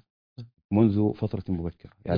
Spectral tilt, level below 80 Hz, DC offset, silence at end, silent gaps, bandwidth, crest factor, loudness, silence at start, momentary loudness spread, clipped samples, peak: -11.5 dB/octave; -52 dBFS; under 0.1%; 0 s; 0.64-0.69 s; 5.2 kHz; 20 dB; -26 LUFS; 0.4 s; 24 LU; under 0.1%; -8 dBFS